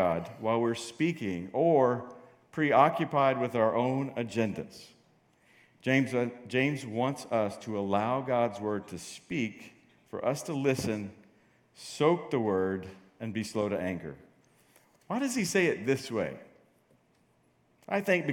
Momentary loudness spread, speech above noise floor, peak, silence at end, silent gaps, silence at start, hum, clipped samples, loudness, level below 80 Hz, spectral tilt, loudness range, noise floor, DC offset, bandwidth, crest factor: 15 LU; 39 dB; -8 dBFS; 0 s; none; 0 s; none; under 0.1%; -30 LUFS; -72 dBFS; -5.5 dB/octave; 5 LU; -68 dBFS; under 0.1%; 17.5 kHz; 22 dB